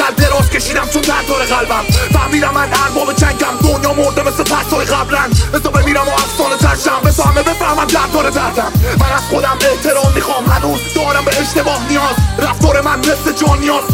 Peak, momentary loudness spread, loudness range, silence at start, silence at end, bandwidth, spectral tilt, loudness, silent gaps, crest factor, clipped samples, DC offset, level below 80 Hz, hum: 0 dBFS; 2 LU; 1 LU; 0 s; 0 s; 17.5 kHz; -4.5 dB/octave; -12 LUFS; none; 12 dB; under 0.1%; under 0.1%; -22 dBFS; none